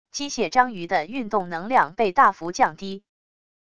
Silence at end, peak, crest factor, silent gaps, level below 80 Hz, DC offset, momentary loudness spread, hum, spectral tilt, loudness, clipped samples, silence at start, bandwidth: 0.65 s; -4 dBFS; 20 dB; none; -58 dBFS; 0.6%; 12 LU; none; -3.5 dB/octave; -22 LUFS; under 0.1%; 0.05 s; 11 kHz